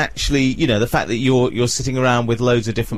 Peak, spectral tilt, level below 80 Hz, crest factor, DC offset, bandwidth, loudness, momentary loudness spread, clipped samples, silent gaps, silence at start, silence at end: -4 dBFS; -5 dB/octave; -34 dBFS; 14 dB; 2%; 15 kHz; -17 LUFS; 2 LU; under 0.1%; none; 0 s; 0 s